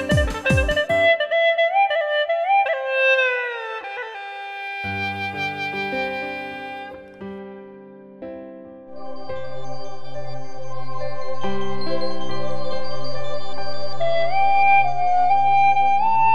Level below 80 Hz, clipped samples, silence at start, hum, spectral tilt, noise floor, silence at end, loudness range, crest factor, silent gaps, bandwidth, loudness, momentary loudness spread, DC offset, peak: -40 dBFS; under 0.1%; 0 s; none; -5 dB/octave; -42 dBFS; 0 s; 17 LU; 14 dB; none; 13.5 kHz; -21 LUFS; 19 LU; under 0.1%; -6 dBFS